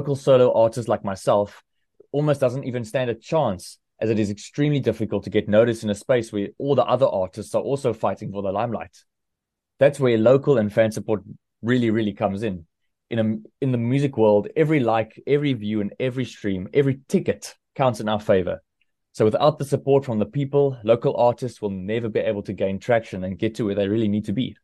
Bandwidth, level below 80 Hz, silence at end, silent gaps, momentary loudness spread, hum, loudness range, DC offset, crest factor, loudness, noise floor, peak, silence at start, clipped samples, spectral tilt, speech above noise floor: 12.5 kHz; -60 dBFS; 0.1 s; none; 10 LU; none; 3 LU; under 0.1%; 18 dB; -22 LUFS; -82 dBFS; -4 dBFS; 0 s; under 0.1%; -7 dB/octave; 61 dB